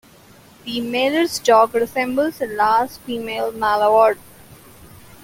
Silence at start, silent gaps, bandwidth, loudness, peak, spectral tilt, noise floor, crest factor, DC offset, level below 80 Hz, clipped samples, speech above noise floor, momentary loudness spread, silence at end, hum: 0.65 s; none; 17 kHz; -18 LUFS; -2 dBFS; -3.5 dB/octave; -47 dBFS; 18 dB; under 0.1%; -56 dBFS; under 0.1%; 29 dB; 12 LU; 0.4 s; none